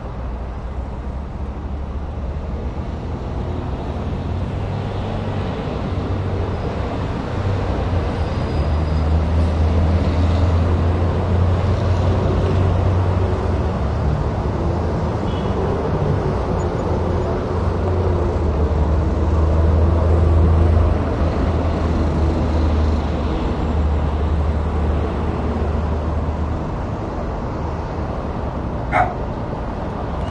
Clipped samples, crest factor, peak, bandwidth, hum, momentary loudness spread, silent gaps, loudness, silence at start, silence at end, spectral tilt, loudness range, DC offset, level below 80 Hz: under 0.1%; 16 dB; -4 dBFS; 7.4 kHz; none; 9 LU; none; -20 LUFS; 0 s; 0 s; -8.5 dB/octave; 7 LU; under 0.1%; -24 dBFS